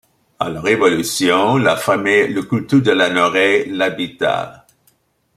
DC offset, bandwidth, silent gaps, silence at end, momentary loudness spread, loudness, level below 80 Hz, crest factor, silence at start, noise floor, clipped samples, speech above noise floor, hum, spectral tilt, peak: under 0.1%; 16 kHz; none; 0.8 s; 7 LU; -15 LUFS; -56 dBFS; 14 dB; 0.4 s; -60 dBFS; under 0.1%; 44 dB; none; -4.5 dB/octave; -2 dBFS